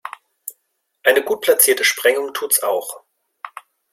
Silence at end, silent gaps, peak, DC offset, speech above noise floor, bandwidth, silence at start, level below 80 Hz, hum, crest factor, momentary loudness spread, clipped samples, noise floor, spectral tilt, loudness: 0.45 s; none; 0 dBFS; under 0.1%; 54 dB; 16.5 kHz; 0.05 s; -72 dBFS; none; 20 dB; 23 LU; under 0.1%; -71 dBFS; 1 dB/octave; -16 LUFS